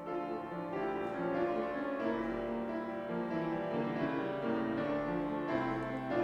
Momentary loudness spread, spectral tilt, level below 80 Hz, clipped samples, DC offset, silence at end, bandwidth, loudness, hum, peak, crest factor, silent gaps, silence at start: 4 LU; -8 dB/octave; -62 dBFS; under 0.1%; under 0.1%; 0 s; 8.4 kHz; -36 LUFS; none; -20 dBFS; 16 dB; none; 0 s